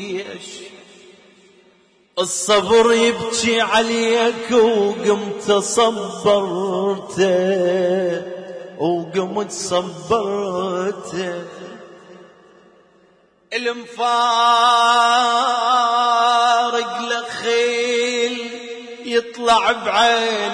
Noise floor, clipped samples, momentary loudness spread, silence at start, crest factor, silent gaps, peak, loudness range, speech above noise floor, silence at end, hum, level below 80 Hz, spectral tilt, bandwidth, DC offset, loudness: -55 dBFS; under 0.1%; 13 LU; 0 s; 14 dB; none; -4 dBFS; 9 LU; 38 dB; 0 s; none; -58 dBFS; -3 dB/octave; 11 kHz; under 0.1%; -17 LUFS